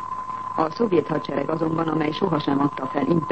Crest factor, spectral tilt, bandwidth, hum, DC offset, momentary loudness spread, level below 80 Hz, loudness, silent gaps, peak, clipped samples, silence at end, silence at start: 16 dB; -8 dB/octave; 8.4 kHz; none; 0.4%; 5 LU; -56 dBFS; -24 LUFS; none; -6 dBFS; under 0.1%; 0 s; 0 s